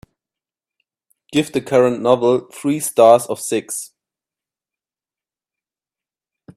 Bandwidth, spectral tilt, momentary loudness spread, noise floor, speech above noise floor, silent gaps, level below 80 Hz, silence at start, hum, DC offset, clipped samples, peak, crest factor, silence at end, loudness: 16 kHz; -4.5 dB/octave; 12 LU; under -90 dBFS; over 74 dB; none; -62 dBFS; 1.3 s; none; under 0.1%; under 0.1%; 0 dBFS; 20 dB; 2.7 s; -17 LUFS